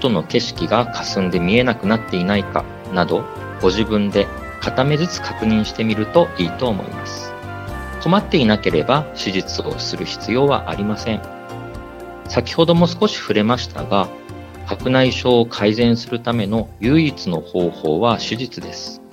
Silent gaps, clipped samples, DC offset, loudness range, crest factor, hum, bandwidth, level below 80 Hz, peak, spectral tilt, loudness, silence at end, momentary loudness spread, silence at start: none; under 0.1%; under 0.1%; 2 LU; 18 dB; none; 15.5 kHz; -40 dBFS; 0 dBFS; -6 dB/octave; -18 LUFS; 0.05 s; 13 LU; 0 s